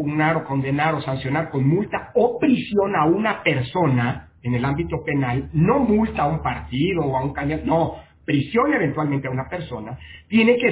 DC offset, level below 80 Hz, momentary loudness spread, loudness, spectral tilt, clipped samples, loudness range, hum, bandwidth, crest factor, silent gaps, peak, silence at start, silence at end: under 0.1%; -42 dBFS; 8 LU; -21 LUFS; -11 dB/octave; under 0.1%; 2 LU; none; 4 kHz; 16 dB; none; -4 dBFS; 0 s; 0 s